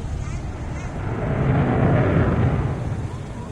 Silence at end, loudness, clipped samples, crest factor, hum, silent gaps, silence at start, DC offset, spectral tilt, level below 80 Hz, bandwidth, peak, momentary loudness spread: 0 s; -22 LUFS; under 0.1%; 14 dB; none; none; 0 s; under 0.1%; -8.5 dB/octave; -32 dBFS; 9.6 kHz; -8 dBFS; 12 LU